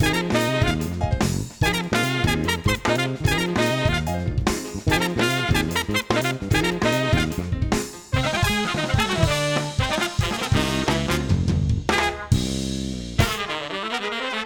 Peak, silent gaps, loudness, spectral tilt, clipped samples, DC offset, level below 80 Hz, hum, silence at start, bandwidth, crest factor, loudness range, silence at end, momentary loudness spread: -4 dBFS; none; -22 LUFS; -4.5 dB/octave; under 0.1%; 0.1%; -34 dBFS; none; 0 s; over 20 kHz; 18 dB; 1 LU; 0 s; 5 LU